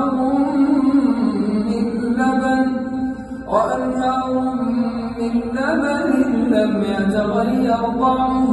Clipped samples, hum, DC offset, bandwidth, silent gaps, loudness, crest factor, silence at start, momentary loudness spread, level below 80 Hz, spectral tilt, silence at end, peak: under 0.1%; none; under 0.1%; 11.5 kHz; none; -18 LUFS; 14 dB; 0 s; 5 LU; -44 dBFS; -7 dB/octave; 0 s; -2 dBFS